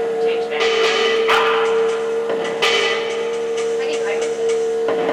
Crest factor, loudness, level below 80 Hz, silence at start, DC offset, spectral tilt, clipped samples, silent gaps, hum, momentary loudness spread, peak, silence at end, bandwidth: 14 dB; -18 LUFS; -60 dBFS; 0 s; under 0.1%; -2 dB/octave; under 0.1%; none; none; 6 LU; -6 dBFS; 0 s; 12 kHz